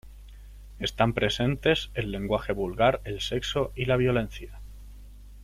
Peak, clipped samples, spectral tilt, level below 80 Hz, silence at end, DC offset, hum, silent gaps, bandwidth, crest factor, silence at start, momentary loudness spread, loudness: -8 dBFS; under 0.1%; -5.5 dB/octave; -42 dBFS; 0 s; under 0.1%; none; none; 15.5 kHz; 20 dB; 0.05 s; 12 LU; -27 LUFS